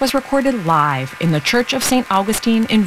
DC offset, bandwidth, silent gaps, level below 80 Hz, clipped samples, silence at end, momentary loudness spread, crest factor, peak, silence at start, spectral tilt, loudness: under 0.1%; 16 kHz; none; -46 dBFS; under 0.1%; 0 s; 3 LU; 14 dB; -2 dBFS; 0 s; -4.5 dB/octave; -16 LUFS